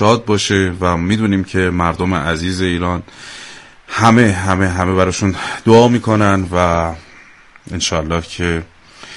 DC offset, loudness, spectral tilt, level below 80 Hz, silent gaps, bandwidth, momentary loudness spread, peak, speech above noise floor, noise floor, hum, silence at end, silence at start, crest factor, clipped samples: under 0.1%; -15 LUFS; -5.5 dB/octave; -36 dBFS; none; 11.5 kHz; 14 LU; 0 dBFS; 28 dB; -42 dBFS; none; 0 s; 0 s; 16 dB; under 0.1%